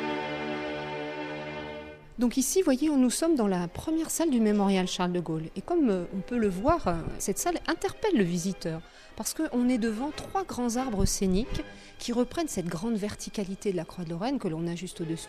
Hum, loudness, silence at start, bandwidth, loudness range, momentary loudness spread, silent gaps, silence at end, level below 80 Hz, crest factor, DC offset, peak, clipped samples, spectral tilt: none; -29 LUFS; 0 s; 15.5 kHz; 5 LU; 11 LU; none; 0 s; -44 dBFS; 18 dB; under 0.1%; -10 dBFS; under 0.1%; -5 dB/octave